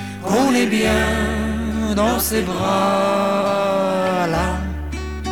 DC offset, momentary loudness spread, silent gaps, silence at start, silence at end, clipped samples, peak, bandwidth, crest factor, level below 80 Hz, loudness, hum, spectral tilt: 0.5%; 6 LU; none; 0 s; 0 s; under 0.1%; -4 dBFS; 18.5 kHz; 14 dB; -30 dBFS; -19 LUFS; none; -5 dB/octave